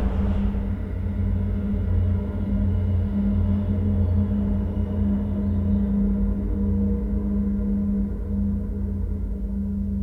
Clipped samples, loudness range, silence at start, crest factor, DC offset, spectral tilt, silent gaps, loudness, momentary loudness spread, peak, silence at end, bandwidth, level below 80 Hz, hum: under 0.1%; 2 LU; 0 s; 12 dB; 0.4%; -11.5 dB/octave; none; -25 LUFS; 5 LU; -10 dBFS; 0 s; 3.7 kHz; -28 dBFS; none